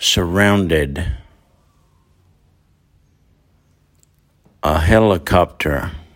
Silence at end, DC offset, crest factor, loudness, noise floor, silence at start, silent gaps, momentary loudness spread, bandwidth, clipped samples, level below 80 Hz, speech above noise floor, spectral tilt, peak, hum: 0.15 s; under 0.1%; 18 dB; -16 LUFS; -57 dBFS; 0 s; none; 11 LU; 16.5 kHz; under 0.1%; -32 dBFS; 42 dB; -5 dB/octave; 0 dBFS; none